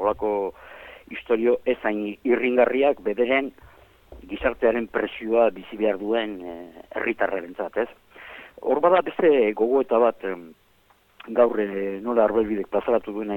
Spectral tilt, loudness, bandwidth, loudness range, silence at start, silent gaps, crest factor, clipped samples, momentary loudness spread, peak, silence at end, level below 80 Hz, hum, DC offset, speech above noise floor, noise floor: -7.5 dB/octave; -23 LUFS; 17.5 kHz; 3 LU; 0 s; none; 18 dB; under 0.1%; 17 LU; -6 dBFS; 0 s; -54 dBFS; none; under 0.1%; 37 dB; -60 dBFS